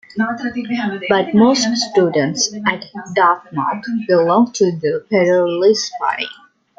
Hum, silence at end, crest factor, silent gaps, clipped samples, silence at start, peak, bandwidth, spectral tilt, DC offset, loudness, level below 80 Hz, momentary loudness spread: none; 0.45 s; 14 dB; none; under 0.1%; 0.15 s; -2 dBFS; 8.8 kHz; -4 dB/octave; under 0.1%; -16 LUFS; -60 dBFS; 9 LU